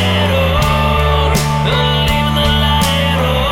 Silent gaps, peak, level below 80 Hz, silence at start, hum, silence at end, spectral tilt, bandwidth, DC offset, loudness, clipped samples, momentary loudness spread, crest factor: none; -2 dBFS; -20 dBFS; 0 s; none; 0 s; -5 dB/octave; 18 kHz; under 0.1%; -13 LUFS; under 0.1%; 2 LU; 10 dB